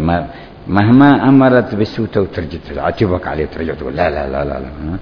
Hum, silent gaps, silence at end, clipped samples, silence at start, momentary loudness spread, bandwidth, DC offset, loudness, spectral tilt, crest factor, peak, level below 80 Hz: none; none; 0 s; 0.2%; 0 s; 16 LU; 5.4 kHz; under 0.1%; -14 LUFS; -9.5 dB/octave; 14 dB; 0 dBFS; -34 dBFS